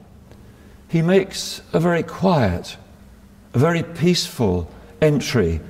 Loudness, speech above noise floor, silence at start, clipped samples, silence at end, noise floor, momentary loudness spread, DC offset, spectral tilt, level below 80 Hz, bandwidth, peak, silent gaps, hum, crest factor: -20 LUFS; 27 dB; 0.5 s; under 0.1%; 0 s; -46 dBFS; 9 LU; under 0.1%; -6 dB/octave; -42 dBFS; 16 kHz; -4 dBFS; none; none; 16 dB